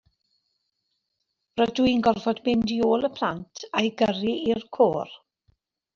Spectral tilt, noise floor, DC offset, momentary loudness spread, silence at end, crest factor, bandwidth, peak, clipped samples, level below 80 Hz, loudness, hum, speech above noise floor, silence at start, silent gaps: -5.5 dB/octave; -79 dBFS; under 0.1%; 8 LU; 0.8 s; 20 dB; 7.2 kHz; -6 dBFS; under 0.1%; -58 dBFS; -24 LUFS; none; 55 dB; 1.55 s; none